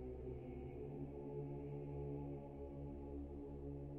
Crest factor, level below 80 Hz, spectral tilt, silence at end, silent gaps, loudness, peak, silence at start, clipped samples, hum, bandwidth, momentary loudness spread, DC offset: 12 dB; -56 dBFS; -11 dB/octave; 0 s; none; -50 LUFS; -36 dBFS; 0 s; under 0.1%; none; 3.5 kHz; 3 LU; under 0.1%